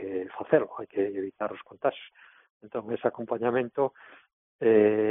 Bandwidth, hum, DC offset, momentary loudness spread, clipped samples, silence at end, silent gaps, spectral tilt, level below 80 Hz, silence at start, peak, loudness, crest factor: 3.8 kHz; none; under 0.1%; 14 LU; under 0.1%; 0 s; 2.50-2.60 s, 4.33-4.59 s; -2.5 dB/octave; -72 dBFS; 0 s; -8 dBFS; -28 LUFS; 20 dB